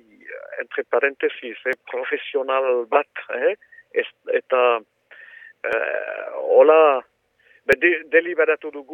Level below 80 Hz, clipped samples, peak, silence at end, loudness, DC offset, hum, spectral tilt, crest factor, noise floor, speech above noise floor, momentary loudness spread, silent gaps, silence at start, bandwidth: -66 dBFS; under 0.1%; -2 dBFS; 0 s; -20 LUFS; under 0.1%; none; -4.5 dB/octave; 20 dB; -58 dBFS; 38 dB; 14 LU; none; 0.25 s; 6.4 kHz